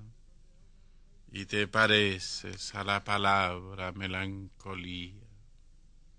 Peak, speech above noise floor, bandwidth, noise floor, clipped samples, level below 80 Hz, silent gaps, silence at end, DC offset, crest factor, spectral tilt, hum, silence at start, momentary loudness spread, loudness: -10 dBFS; 24 dB; 10.5 kHz; -56 dBFS; under 0.1%; -56 dBFS; none; 0.45 s; under 0.1%; 24 dB; -4 dB/octave; none; 0 s; 18 LU; -30 LUFS